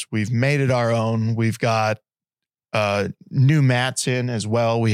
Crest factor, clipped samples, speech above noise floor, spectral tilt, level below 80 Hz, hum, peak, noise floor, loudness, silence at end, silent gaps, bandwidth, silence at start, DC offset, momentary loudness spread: 14 dB; under 0.1%; 69 dB; -6 dB/octave; -62 dBFS; none; -6 dBFS; -89 dBFS; -20 LUFS; 0 s; none; 13 kHz; 0 s; under 0.1%; 7 LU